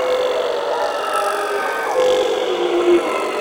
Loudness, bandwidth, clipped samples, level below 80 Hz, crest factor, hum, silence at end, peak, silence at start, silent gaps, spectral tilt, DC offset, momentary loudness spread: -18 LUFS; 17 kHz; under 0.1%; -58 dBFS; 14 dB; none; 0 s; -4 dBFS; 0 s; none; -3 dB/octave; under 0.1%; 5 LU